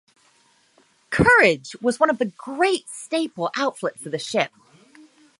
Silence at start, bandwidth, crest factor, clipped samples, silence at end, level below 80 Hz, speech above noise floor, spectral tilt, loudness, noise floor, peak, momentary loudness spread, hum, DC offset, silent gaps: 1.1 s; 11.5 kHz; 22 dB; under 0.1%; 0.95 s; -48 dBFS; 39 dB; -4.5 dB/octave; -21 LUFS; -60 dBFS; -2 dBFS; 13 LU; none; under 0.1%; none